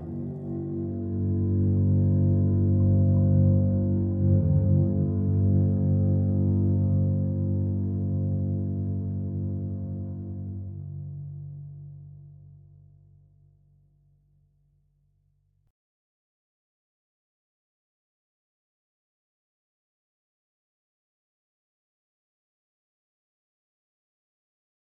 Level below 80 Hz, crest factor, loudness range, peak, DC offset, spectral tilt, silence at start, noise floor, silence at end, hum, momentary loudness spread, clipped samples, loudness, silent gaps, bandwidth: -52 dBFS; 16 dB; 17 LU; -12 dBFS; under 0.1%; -15.5 dB/octave; 0 s; -68 dBFS; 12.65 s; none; 16 LU; under 0.1%; -25 LUFS; none; 1.3 kHz